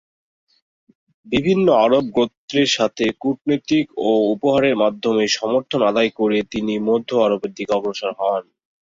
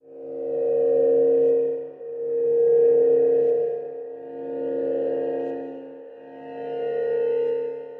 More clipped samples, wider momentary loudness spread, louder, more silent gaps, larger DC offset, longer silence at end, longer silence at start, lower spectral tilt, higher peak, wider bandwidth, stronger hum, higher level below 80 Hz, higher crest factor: neither; second, 6 LU vs 18 LU; first, -19 LUFS vs -22 LUFS; first, 2.37-2.48 s vs none; neither; first, 0.4 s vs 0 s; first, 1.25 s vs 0.05 s; second, -5 dB/octave vs -9.5 dB/octave; first, -4 dBFS vs -12 dBFS; first, 7.8 kHz vs 3.2 kHz; neither; first, -56 dBFS vs -78 dBFS; about the same, 16 dB vs 12 dB